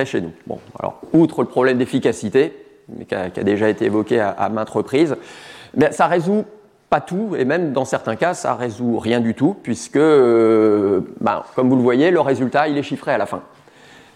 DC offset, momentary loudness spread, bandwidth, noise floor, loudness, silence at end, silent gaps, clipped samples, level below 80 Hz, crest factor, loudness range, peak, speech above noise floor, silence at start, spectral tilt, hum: under 0.1%; 13 LU; 12 kHz; -46 dBFS; -18 LUFS; 0.7 s; none; under 0.1%; -60 dBFS; 16 dB; 4 LU; -2 dBFS; 28 dB; 0 s; -6.5 dB/octave; none